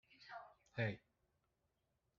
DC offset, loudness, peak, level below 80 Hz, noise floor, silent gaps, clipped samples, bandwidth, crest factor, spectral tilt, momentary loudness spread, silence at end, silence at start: under 0.1%; -48 LUFS; -26 dBFS; -80 dBFS; -86 dBFS; none; under 0.1%; 7 kHz; 24 dB; -5 dB/octave; 13 LU; 1.2 s; 0.1 s